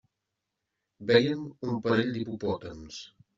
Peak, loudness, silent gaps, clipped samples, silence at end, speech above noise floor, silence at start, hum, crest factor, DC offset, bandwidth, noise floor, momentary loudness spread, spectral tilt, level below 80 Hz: -6 dBFS; -28 LUFS; none; under 0.1%; 0.3 s; 56 dB; 1 s; none; 24 dB; under 0.1%; 7.6 kHz; -85 dBFS; 18 LU; -4.5 dB/octave; -64 dBFS